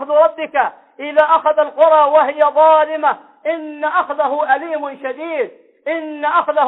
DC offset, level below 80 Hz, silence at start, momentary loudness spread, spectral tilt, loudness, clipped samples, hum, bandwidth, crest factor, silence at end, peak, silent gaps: under 0.1%; -66 dBFS; 0 s; 13 LU; -5.5 dB/octave; -15 LUFS; under 0.1%; none; 4 kHz; 14 dB; 0 s; -2 dBFS; none